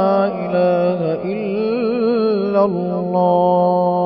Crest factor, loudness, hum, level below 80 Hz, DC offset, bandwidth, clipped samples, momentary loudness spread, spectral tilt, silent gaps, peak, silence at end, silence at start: 12 dB; -17 LUFS; none; -64 dBFS; 0.1%; 5.8 kHz; under 0.1%; 6 LU; -12.5 dB/octave; none; -4 dBFS; 0 s; 0 s